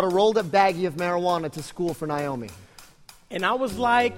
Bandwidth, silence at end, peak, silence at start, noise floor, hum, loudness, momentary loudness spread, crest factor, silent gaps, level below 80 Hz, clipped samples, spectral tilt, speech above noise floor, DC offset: 16.5 kHz; 0 s; -6 dBFS; 0 s; -50 dBFS; none; -24 LUFS; 12 LU; 18 dB; none; -56 dBFS; under 0.1%; -5 dB/octave; 26 dB; under 0.1%